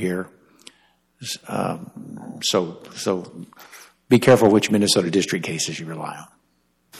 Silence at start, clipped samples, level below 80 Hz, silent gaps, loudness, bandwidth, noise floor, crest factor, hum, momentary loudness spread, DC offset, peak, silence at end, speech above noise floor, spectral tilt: 0 s; under 0.1%; -60 dBFS; none; -21 LUFS; 15 kHz; -66 dBFS; 18 dB; none; 23 LU; under 0.1%; -4 dBFS; 0 s; 45 dB; -4.5 dB/octave